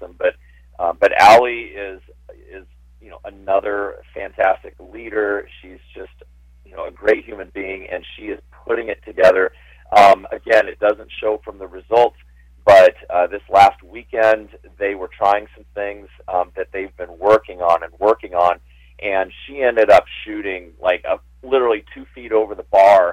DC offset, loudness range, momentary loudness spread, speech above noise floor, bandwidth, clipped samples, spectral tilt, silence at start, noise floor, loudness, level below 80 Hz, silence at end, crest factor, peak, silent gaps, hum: under 0.1%; 9 LU; 20 LU; 31 dB; 15 kHz; under 0.1%; -4.5 dB/octave; 0 s; -47 dBFS; -17 LUFS; -46 dBFS; 0 s; 14 dB; -2 dBFS; none; 60 Hz at -50 dBFS